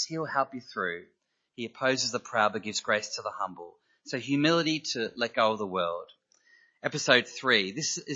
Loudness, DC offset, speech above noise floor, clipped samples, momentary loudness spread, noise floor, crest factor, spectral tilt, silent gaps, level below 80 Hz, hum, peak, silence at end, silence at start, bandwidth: -28 LUFS; under 0.1%; 34 dB; under 0.1%; 13 LU; -63 dBFS; 26 dB; -3 dB/octave; none; -78 dBFS; none; -4 dBFS; 0 s; 0 s; 8 kHz